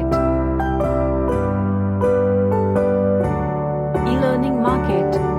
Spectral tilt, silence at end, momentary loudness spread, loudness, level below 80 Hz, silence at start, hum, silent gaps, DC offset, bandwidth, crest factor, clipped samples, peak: -9 dB/octave; 0 s; 3 LU; -19 LUFS; -30 dBFS; 0 s; none; none; under 0.1%; 11.5 kHz; 14 dB; under 0.1%; -4 dBFS